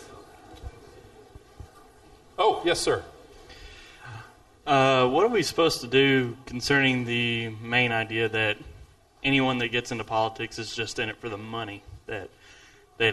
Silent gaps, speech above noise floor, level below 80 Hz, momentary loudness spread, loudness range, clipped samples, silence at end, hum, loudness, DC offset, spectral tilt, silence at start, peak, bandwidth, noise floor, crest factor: none; 28 dB; -54 dBFS; 23 LU; 7 LU; under 0.1%; 0 s; none; -25 LUFS; under 0.1%; -4.5 dB/octave; 0 s; -6 dBFS; 12 kHz; -53 dBFS; 20 dB